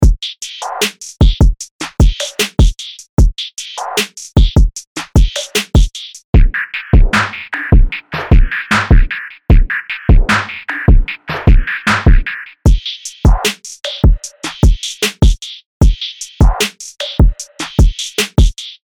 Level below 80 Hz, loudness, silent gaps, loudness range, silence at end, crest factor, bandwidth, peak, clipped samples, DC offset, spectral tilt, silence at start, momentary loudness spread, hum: -14 dBFS; -15 LUFS; 1.71-1.79 s, 3.09-3.17 s, 4.87-4.96 s, 6.24-6.33 s, 15.66-15.80 s; 2 LU; 0.25 s; 10 dB; 18 kHz; -2 dBFS; under 0.1%; 0.8%; -5 dB/octave; 0 s; 11 LU; none